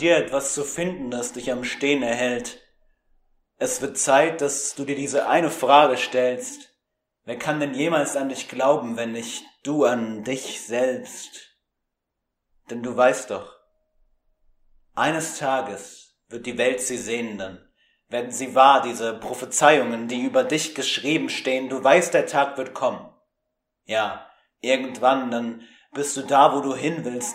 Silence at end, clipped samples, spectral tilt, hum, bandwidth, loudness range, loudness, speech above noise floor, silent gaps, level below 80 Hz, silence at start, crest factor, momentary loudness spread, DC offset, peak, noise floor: 0 s; under 0.1%; -3 dB/octave; none; 16 kHz; 7 LU; -22 LUFS; 58 dB; none; -64 dBFS; 0 s; 24 dB; 16 LU; under 0.1%; 0 dBFS; -81 dBFS